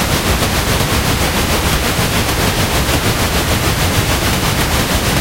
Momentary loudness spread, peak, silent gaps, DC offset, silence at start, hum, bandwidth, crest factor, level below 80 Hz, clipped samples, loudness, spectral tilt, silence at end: 1 LU; 0 dBFS; none; under 0.1%; 0 s; none; 16 kHz; 14 dB; -22 dBFS; under 0.1%; -14 LUFS; -3.5 dB/octave; 0 s